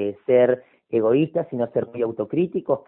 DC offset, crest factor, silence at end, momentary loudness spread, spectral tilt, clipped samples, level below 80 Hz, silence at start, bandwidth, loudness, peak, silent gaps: under 0.1%; 16 dB; 0.05 s; 8 LU; -12 dB/octave; under 0.1%; -64 dBFS; 0 s; 3.8 kHz; -22 LUFS; -6 dBFS; none